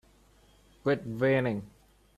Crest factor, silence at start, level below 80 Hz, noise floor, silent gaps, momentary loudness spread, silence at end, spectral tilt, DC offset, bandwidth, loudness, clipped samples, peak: 18 dB; 0.85 s; -62 dBFS; -61 dBFS; none; 8 LU; 0.5 s; -8 dB/octave; under 0.1%; 13.5 kHz; -30 LUFS; under 0.1%; -14 dBFS